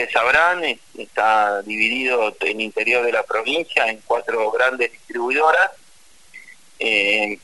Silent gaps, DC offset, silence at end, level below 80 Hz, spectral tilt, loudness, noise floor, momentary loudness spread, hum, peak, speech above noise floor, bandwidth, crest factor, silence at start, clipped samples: none; 0.4%; 0.1 s; -60 dBFS; -2.5 dB/octave; -18 LUFS; -53 dBFS; 8 LU; none; -2 dBFS; 33 dB; 11.5 kHz; 18 dB; 0 s; under 0.1%